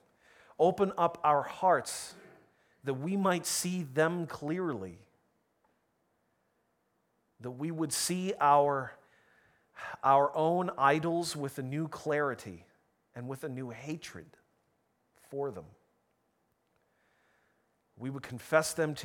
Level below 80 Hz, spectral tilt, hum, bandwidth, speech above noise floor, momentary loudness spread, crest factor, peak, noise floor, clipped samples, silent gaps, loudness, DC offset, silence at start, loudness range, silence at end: -74 dBFS; -4.5 dB/octave; none; over 20 kHz; 45 dB; 18 LU; 24 dB; -10 dBFS; -76 dBFS; under 0.1%; none; -31 LUFS; under 0.1%; 0.6 s; 16 LU; 0 s